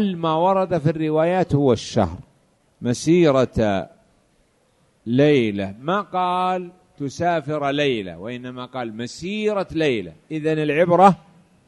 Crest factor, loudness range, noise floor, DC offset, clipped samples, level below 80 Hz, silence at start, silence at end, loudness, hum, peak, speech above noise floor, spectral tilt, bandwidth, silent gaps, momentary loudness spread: 20 dB; 4 LU; -61 dBFS; under 0.1%; under 0.1%; -50 dBFS; 0 s; 0.5 s; -20 LUFS; none; 0 dBFS; 42 dB; -6.5 dB/octave; 11.5 kHz; none; 15 LU